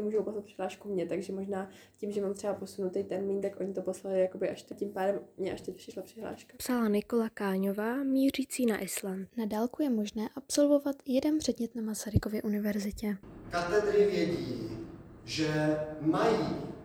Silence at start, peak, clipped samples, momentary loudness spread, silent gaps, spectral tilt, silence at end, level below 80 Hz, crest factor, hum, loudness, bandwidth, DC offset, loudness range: 0 s; -12 dBFS; under 0.1%; 11 LU; none; -5.5 dB/octave; 0 s; -56 dBFS; 20 dB; none; -32 LUFS; 17.5 kHz; under 0.1%; 4 LU